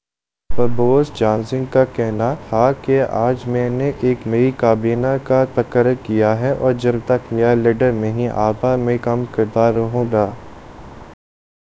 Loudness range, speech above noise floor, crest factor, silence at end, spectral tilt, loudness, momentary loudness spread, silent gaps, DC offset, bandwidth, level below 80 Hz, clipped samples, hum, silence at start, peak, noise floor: 2 LU; 71 dB; 16 dB; 0.6 s; -8.5 dB/octave; -17 LUFS; 4 LU; none; under 0.1%; 8 kHz; -42 dBFS; under 0.1%; none; 0 s; 0 dBFS; -87 dBFS